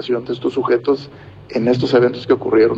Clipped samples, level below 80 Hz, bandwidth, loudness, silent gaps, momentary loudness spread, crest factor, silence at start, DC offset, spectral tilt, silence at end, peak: under 0.1%; -52 dBFS; 7.6 kHz; -17 LUFS; none; 8 LU; 14 dB; 0 s; under 0.1%; -7.5 dB/octave; 0 s; -2 dBFS